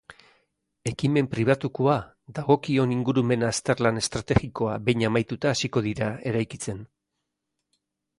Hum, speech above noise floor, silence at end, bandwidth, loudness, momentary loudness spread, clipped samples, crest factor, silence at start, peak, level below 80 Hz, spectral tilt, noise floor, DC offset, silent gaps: none; 57 dB; 1.35 s; 11.5 kHz; -25 LUFS; 9 LU; under 0.1%; 20 dB; 0.1 s; -6 dBFS; -50 dBFS; -5.5 dB/octave; -82 dBFS; under 0.1%; none